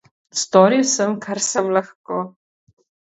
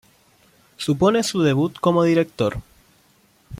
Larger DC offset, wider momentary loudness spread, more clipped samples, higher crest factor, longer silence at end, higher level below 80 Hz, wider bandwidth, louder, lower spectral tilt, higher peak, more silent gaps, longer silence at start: neither; first, 13 LU vs 7 LU; neither; about the same, 20 dB vs 16 dB; first, 0.8 s vs 0.05 s; second, -70 dBFS vs -50 dBFS; second, 8.2 kHz vs 16 kHz; about the same, -18 LUFS vs -20 LUFS; second, -3.5 dB/octave vs -6 dB/octave; first, 0 dBFS vs -4 dBFS; first, 1.95-2.04 s vs none; second, 0.35 s vs 0.8 s